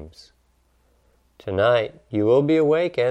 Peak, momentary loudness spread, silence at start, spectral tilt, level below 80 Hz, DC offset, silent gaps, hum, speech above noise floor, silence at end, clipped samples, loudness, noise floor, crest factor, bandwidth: -6 dBFS; 10 LU; 0 s; -7.5 dB/octave; -58 dBFS; under 0.1%; none; none; 43 dB; 0 s; under 0.1%; -20 LUFS; -63 dBFS; 16 dB; 8.8 kHz